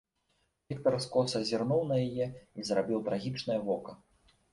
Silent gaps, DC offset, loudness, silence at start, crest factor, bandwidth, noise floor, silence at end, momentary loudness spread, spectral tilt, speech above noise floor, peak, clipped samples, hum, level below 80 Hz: none; under 0.1%; -32 LUFS; 0.7 s; 18 dB; 11.5 kHz; -76 dBFS; 0.55 s; 8 LU; -6 dB/octave; 45 dB; -14 dBFS; under 0.1%; none; -66 dBFS